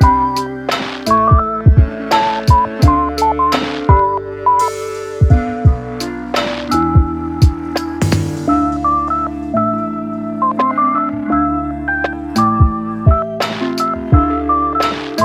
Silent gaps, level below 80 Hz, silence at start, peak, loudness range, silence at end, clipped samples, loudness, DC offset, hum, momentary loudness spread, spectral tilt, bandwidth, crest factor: none; -22 dBFS; 0 s; 0 dBFS; 3 LU; 0 s; under 0.1%; -15 LUFS; under 0.1%; none; 7 LU; -6.5 dB/octave; 15 kHz; 14 dB